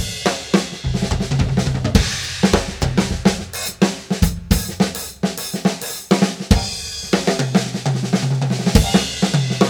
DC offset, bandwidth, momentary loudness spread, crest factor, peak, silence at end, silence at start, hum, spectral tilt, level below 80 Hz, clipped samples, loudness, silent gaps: under 0.1%; over 20 kHz; 5 LU; 18 dB; 0 dBFS; 0 s; 0 s; none; -5 dB/octave; -28 dBFS; under 0.1%; -19 LUFS; none